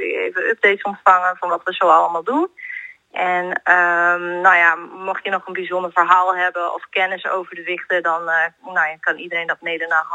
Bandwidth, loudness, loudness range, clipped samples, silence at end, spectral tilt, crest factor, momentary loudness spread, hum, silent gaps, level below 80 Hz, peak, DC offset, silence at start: 9 kHz; -17 LUFS; 4 LU; under 0.1%; 0 s; -4 dB/octave; 18 dB; 11 LU; none; none; -76 dBFS; 0 dBFS; under 0.1%; 0 s